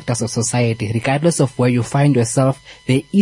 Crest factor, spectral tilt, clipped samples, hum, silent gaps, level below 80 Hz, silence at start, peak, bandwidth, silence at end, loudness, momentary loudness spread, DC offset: 14 dB; -5.5 dB/octave; under 0.1%; none; none; -50 dBFS; 0 s; -2 dBFS; 11.5 kHz; 0 s; -17 LUFS; 5 LU; under 0.1%